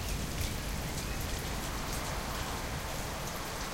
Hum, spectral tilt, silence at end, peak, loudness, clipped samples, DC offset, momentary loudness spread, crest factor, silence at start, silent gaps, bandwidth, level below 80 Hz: none; -3.5 dB/octave; 0 s; -22 dBFS; -37 LUFS; under 0.1%; under 0.1%; 2 LU; 14 dB; 0 s; none; 17 kHz; -40 dBFS